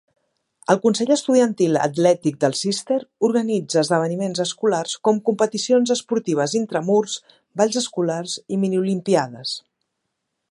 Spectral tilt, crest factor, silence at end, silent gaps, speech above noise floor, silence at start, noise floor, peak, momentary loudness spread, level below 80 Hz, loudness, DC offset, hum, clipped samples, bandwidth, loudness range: -4.5 dB/octave; 20 dB; 0.9 s; none; 57 dB; 0.7 s; -77 dBFS; -2 dBFS; 8 LU; -72 dBFS; -20 LUFS; under 0.1%; none; under 0.1%; 11.5 kHz; 3 LU